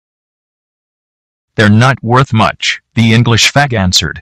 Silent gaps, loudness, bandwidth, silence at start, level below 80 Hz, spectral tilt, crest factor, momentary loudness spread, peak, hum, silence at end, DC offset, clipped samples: none; -9 LUFS; 14.5 kHz; 1.6 s; -40 dBFS; -4.5 dB/octave; 12 dB; 5 LU; 0 dBFS; none; 0 s; under 0.1%; under 0.1%